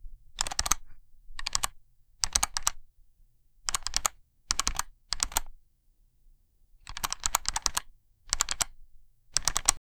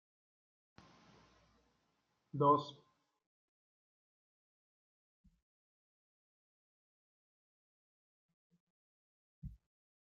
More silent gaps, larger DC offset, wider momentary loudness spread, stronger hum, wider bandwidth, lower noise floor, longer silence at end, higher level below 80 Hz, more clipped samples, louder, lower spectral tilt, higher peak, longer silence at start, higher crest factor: second, none vs 3.26-5.24 s, 5.42-8.50 s, 8.60-9.42 s; neither; second, 10 LU vs 24 LU; neither; first, over 20 kHz vs 7 kHz; second, -65 dBFS vs -82 dBFS; second, 0.2 s vs 0.5 s; first, -44 dBFS vs -72 dBFS; neither; first, -30 LUFS vs -33 LUFS; second, 0.5 dB/octave vs -7.5 dB/octave; first, -2 dBFS vs -18 dBFS; second, 0 s vs 2.35 s; about the same, 32 dB vs 28 dB